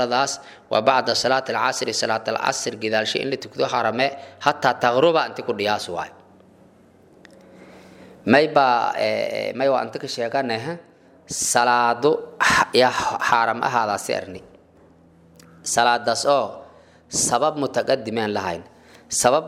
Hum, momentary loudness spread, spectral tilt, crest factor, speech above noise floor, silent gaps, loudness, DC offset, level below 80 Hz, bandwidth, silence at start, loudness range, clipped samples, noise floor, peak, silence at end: none; 11 LU; -2.5 dB/octave; 22 dB; 31 dB; none; -21 LUFS; under 0.1%; -60 dBFS; 16 kHz; 0 s; 4 LU; under 0.1%; -52 dBFS; 0 dBFS; 0 s